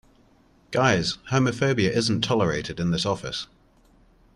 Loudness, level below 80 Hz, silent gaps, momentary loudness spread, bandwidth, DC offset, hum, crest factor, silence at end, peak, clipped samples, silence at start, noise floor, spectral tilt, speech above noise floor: -24 LUFS; -52 dBFS; none; 8 LU; 11.5 kHz; under 0.1%; none; 18 dB; 0.9 s; -6 dBFS; under 0.1%; 0.7 s; -58 dBFS; -5 dB/octave; 35 dB